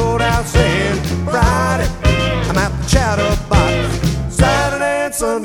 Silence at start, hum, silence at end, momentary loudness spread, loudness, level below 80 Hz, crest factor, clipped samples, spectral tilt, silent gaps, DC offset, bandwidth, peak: 0 s; none; 0 s; 4 LU; -15 LUFS; -22 dBFS; 14 dB; under 0.1%; -5 dB/octave; none; under 0.1%; 18 kHz; 0 dBFS